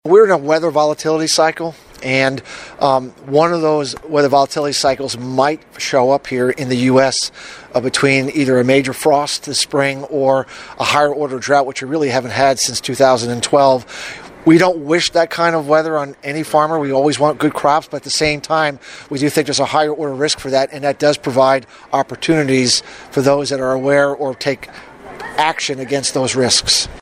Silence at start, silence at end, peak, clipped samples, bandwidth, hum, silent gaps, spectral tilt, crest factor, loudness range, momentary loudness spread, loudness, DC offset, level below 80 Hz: 0.05 s; 0 s; 0 dBFS; under 0.1%; 16 kHz; none; none; -4 dB/octave; 16 dB; 2 LU; 8 LU; -15 LUFS; under 0.1%; -50 dBFS